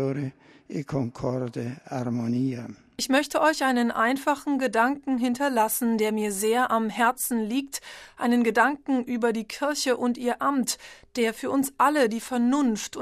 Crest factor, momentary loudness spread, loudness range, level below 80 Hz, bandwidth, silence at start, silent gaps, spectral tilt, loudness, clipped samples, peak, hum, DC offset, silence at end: 18 dB; 11 LU; 2 LU; -62 dBFS; 15 kHz; 0 s; none; -4.5 dB/octave; -25 LUFS; under 0.1%; -6 dBFS; none; under 0.1%; 0 s